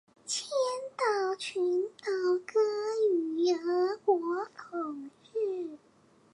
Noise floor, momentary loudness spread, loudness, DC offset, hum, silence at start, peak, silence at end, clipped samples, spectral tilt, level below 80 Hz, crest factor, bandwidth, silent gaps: -63 dBFS; 10 LU; -31 LUFS; under 0.1%; none; 0.25 s; -14 dBFS; 0.55 s; under 0.1%; -2 dB/octave; -86 dBFS; 16 dB; 11 kHz; none